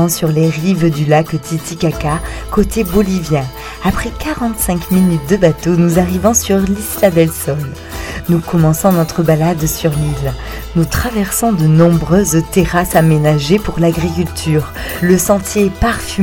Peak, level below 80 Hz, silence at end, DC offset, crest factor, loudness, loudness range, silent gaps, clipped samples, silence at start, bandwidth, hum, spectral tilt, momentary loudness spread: 0 dBFS; -28 dBFS; 0 s; under 0.1%; 12 dB; -13 LUFS; 3 LU; none; under 0.1%; 0 s; 17.5 kHz; none; -5.5 dB/octave; 8 LU